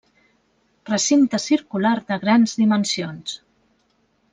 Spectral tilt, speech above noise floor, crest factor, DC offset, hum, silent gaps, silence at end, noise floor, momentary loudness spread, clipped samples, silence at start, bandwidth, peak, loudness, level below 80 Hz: -4 dB/octave; 45 dB; 18 dB; under 0.1%; none; none; 0.95 s; -65 dBFS; 13 LU; under 0.1%; 0.85 s; 9.6 kHz; -4 dBFS; -19 LUFS; -66 dBFS